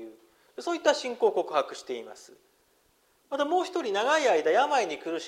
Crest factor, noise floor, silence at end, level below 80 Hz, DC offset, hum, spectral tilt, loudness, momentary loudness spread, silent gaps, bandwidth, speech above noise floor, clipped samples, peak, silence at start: 20 dB; -67 dBFS; 0 s; -80 dBFS; under 0.1%; none; -2 dB/octave; -27 LUFS; 15 LU; none; 15 kHz; 40 dB; under 0.1%; -8 dBFS; 0 s